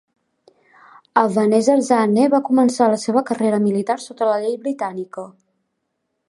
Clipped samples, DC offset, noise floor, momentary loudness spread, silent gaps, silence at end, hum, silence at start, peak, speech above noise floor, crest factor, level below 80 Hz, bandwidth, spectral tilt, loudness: under 0.1%; under 0.1%; -74 dBFS; 11 LU; none; 1 s; none; 1.15 s; -2 dBFS; 57 dB; 18 dB; -70 dBFS; 11.5 kHz; -6 dB/octave; -18 LUFS